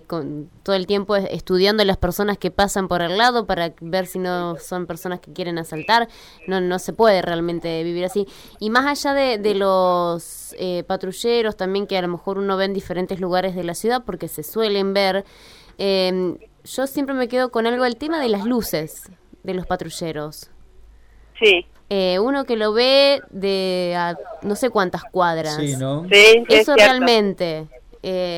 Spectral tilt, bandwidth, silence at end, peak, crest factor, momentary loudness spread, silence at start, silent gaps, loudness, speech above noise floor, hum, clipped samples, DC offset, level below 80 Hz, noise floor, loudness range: -4 dB/octave; 18.5 kHz; 0 s; -4 dBFS; 16 dB; 14 LU; 0.1 s; none; -19 LUFS; 28 dB; none; under 0.1%; under 0.1%; -46 dBFS; -47 dBFS; 8 LU